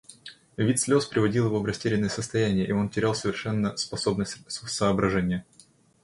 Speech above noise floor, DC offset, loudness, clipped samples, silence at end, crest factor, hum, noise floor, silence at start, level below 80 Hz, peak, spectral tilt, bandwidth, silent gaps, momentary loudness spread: 23 dB; under 0.1%; -26 LUFS; under 0.1%; 0.6 s; 18 dB; none; -48 dBFS; 0.1 s; -52 dBFS; -10 dBFS; -5 dB/octave; 11.5 kHz; none; 9 LU